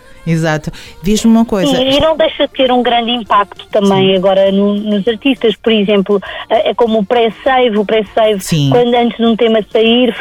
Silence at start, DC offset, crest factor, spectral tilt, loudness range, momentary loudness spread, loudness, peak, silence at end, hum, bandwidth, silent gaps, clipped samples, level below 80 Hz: 0.25 s; under 0.1%; 10 dB; -5.5 dB/octave; 1 LU; 5 LU; -11 LUFS; -2 dBFS; 0 s; none; 17 kHz; none; under 0.1%; -36 dBFS